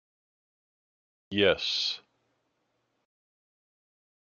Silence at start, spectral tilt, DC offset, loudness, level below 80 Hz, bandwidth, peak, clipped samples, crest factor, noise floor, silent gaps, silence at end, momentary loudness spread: 1.3 s; -3.5 dB/octave; under 0.1%; -27 LUFS; -70 dBFS; 7.2 kHz; -8 dBFS; under 0.1%; 26 dB; -77 dBFS; none; 2.25 s; 10 LU